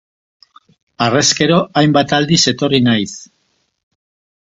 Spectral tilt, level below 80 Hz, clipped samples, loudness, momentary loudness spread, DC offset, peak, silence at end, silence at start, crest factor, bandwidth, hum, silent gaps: -4 dB/octave; -50 dBFS; under 0.1%; -13 LUFS; 7 LU; under 0.1%; 0 dBFS; 1.15 s; 1 s; 16 dB; 8.2 kHz; none; none